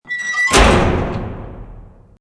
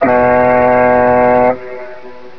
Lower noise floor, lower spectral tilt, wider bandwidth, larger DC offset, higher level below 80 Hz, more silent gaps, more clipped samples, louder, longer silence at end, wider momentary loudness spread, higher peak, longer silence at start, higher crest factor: first, -38 dBFS vs -33 dBFS; second, -4 dB/octave vs -9.5 dB/octave; first, 11 kHz vs 5.4 kHz; second, under 0.1% vs 2%; first, -24 dBFS vs -38 dBFS; neither; neither; second, -14 LUFS vs -10 LUFS; first, 0.35 s vs 0.1 s; about the same, 20 LU vs 18 LU; about the same, 0 dBFS vs 0 dBFS; about the same, 0.05 s vs 0 s; about the same, 16 dB vs 12 dB